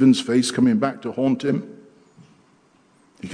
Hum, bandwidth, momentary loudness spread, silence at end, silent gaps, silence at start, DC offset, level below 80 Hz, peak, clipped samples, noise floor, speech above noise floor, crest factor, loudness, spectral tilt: none; 10 kHz; 13 LU; 0 s; none; 0 s; under 0.1%; -62 dBFS; -6 dBFS; under 0.1%; -58 dBFS; 38 dB; 16 dB; -21 LUFS; -5.5 dB/octave